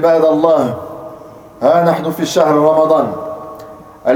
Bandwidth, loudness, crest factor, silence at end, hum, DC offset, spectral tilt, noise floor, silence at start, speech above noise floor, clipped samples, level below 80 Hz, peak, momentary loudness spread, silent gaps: 19 kHz; -13 LUFS; 14 dB; 0 s; none; under 0.1%; -6 dB/octave; -35 dBFS; 0 s; 23 dB; under 0.1%; -54 dBFS; 0 dBFS; 19 LU; none